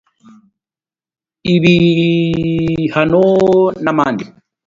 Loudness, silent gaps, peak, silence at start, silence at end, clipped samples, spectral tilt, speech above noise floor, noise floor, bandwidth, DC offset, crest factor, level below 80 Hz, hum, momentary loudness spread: -13 LUFS; none; 0 dBFS; 1.45 s; 0.4 s; under 0.1%; -7.5 dB/octave; over 78 dB; under -90 dBFS; 7.4 kHz; under 0.1%; 14 dB; -44 dBFS; none; 7 LU